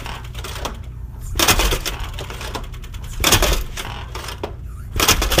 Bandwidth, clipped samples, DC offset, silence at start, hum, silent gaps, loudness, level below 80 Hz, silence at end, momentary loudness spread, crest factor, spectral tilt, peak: 16 kHz; under 0.1%; under 0.1%; 0 s; none; none; -20 LUFS; -26 dBFS; 0 s; 19 LU; 22 dB; -2.5 dB/octave; 0 dBFS